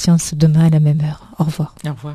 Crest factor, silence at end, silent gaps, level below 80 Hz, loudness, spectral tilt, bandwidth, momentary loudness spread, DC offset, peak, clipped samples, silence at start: 14 dB; 0 s; none; -44 dBFS; -15 LUFS; -6.5 dB/octave; 13.5 kHz; 12 LU; under 0.1%; -2 dBFS; under 0.1%; 0 s